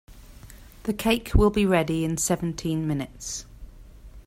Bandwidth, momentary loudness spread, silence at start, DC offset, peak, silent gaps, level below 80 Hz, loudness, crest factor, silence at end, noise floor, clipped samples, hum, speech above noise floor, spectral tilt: 16 kHz; 13 LU; 0.1 s; under 0.1%; -6 dBFS; none; -34 dBFS; -25 LUFS; 20 dB; 0.05 s; -46 dBFS; under 0.1%; none; 22 dB; -5 dB/octave